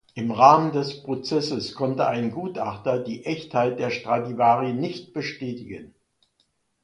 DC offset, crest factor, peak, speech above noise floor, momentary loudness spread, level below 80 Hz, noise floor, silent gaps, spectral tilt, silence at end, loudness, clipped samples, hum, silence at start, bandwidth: under 0.1%; 24 dB; 0 dBFS; 47 dB; 14 LU; -64 dBFS; -70 dBFS; none; -6 dB/octave; 0.95 s; -23 LUFS; under 0.1%; none; 0.15 s; 10.5 kHz